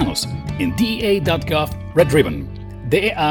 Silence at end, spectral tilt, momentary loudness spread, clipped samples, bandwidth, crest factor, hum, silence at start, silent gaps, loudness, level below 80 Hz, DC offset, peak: 0 s; -5.5 dB/octave; 10 LU; under 0.1%; 18 kHz; 18 dB; none; 0 s; none; -19 LUFS; -36 dBFS; under 0.1%; 0 dBFS